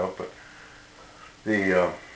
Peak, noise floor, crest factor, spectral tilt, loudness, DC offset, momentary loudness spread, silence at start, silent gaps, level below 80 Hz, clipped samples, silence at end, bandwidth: -8 dBFS; -49 dBFS; 20 dB; -6 dB/octave; -25 LUFS; under 0.1%; 25 LU; 0 s; none; -56 dBFS; under 0.1%; 0 s; 8 kHz